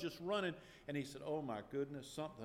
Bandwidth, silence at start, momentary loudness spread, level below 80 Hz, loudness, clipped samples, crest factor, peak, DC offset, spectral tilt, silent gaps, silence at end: 16.5 kHz; 0 s; 7 LU; -72 dBFS; -44 LUFS; under 0.1%; 16 dB; -28 dBFS; under 0.1%; -5.5 dB/octave; none; 0 s